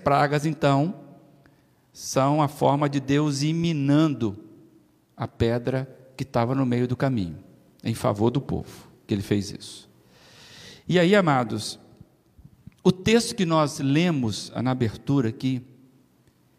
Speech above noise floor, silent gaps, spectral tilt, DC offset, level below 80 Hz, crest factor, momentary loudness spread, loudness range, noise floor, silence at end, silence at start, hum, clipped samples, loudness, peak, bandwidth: 38 dB; none; -6 dB/octave; under 0.1%; -56 dBFS; 18 dB; 16 LU; 4 LU; -61 dBFS; 0.95 s; 0 s; none; under 0.1%; -24 LUFS; -6 dBFS; 15 kHz